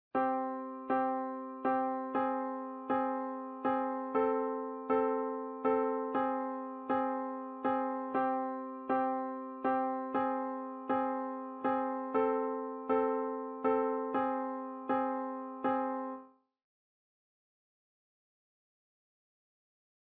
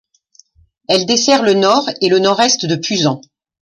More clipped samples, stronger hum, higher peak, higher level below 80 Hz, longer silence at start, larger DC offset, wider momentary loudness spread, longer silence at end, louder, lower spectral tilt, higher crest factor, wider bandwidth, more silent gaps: neither; neither; second, -18 dBFS vs 0 dBFS; second, -78 dBFS vs -58 dBFS; second, 0.15 s vs 0.9 s; neither; about the same, 7 LU vs 5 LU; first, 3.85 s vs 0.4 s; second, -35 LUFS vs -13 LUFS; about the same, -4.5 dB/octave vs -3.5 dB/octave; about the same, 18 dB vs 14 dB; second, 4.5 kHz vs 11 kHz; neither